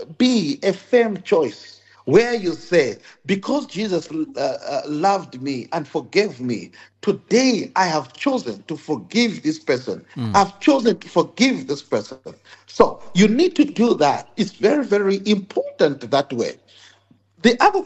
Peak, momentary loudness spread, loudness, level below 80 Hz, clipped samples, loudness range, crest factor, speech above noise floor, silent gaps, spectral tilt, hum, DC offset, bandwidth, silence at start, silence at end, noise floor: -2 dBFS; 10 LU; -20 LUFS; -54 dBFS; under 0.1%; 4 LU; 18 dB; 36 dB; none; -5 dB/octave; none; under 0.1%; 8.4 kHz; 0 s; 0 s; -56 dBFS